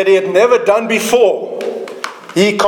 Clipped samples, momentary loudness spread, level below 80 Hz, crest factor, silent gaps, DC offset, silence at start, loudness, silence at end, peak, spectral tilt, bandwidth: under 0.1%; 13 LU; -60 dBFS; 12 dB; none; under 0.1%; 0 s; -13 LUFS; 0 s; 0 dBFS; -4 dB/octave; 19 kHz